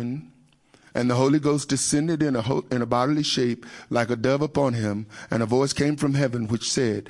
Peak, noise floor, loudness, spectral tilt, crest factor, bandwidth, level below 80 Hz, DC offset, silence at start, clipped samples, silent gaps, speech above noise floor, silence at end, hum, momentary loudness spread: -6 dBFS; -57 dBFS; -24 LUFS; -5 dB/octave; 18 dB; 11.5 kHz; -56 dBFS; under 0.1%; 0 s; under 0.1%; none; 34 dB; 0 s; none; 7 LU